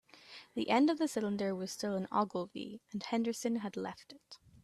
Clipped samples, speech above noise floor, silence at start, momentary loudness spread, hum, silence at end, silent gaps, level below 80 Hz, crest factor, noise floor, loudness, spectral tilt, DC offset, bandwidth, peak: under 0.1%; 21 dB; 0.15 s; 23 LU; none; 0.25 s; none; -76 dBFS; 20 dB; -56 dBFS; -36 LUFS; -5 dB/octave; under 0.1%; 14 kHz; -16 dBFS